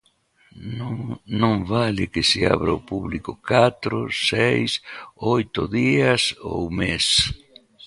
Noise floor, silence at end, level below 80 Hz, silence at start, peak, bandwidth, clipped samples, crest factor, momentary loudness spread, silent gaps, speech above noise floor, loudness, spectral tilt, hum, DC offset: -60 dBFS; 0 s; -44 dBFS; 0.55 s; -2 dBFS; 11.5 kHz; under 0.1%; 20 dB; 12 LU; none; 39 dB; -21 LUFS; -4.5 dB/octave; none; under 0.1%